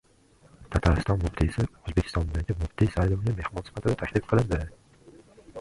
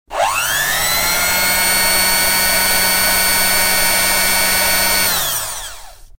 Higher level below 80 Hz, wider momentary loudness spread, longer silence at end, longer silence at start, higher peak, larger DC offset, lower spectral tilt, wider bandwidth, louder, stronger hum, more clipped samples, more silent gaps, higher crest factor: about the same, -34 dBFS vs -36 dBFS; about the same, 7 LU vs 5 LU; about the same, 0 s vs 0.1 s; first, 0.6 s vs 0.1 s; second, -8 dBFS vs -2 dBFS; neither; first, -7.5 dB/octave vs 0 dB/octave; second, 11.5 kHz vs 16.5 kHz; second, -28 LUFS vs -12 LUFS; neither; neither; neither; first, 20 dB vs 14 dB